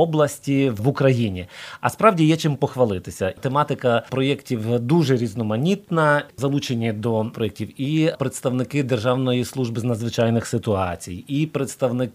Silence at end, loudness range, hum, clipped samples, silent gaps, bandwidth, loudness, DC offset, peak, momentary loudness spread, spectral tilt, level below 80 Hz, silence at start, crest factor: 0.05 s; 2 LU; none; under 0.1%; none; 15.5 kHz; -21 LUFS; under 0.1%; 0 dBFS; 8 LU; -6.5 dB/octave; -56 dBFS; 0 s; 20 dB